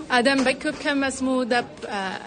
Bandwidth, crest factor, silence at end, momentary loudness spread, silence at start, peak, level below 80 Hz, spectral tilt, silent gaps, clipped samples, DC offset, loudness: 9.6 kHz; 16 dB; 0 s; 9 LU; 0 s; -6 dBFS; -56 dBFS; -3 dB/octave; none; under 0.1%; under 0.1%; -23 LUFS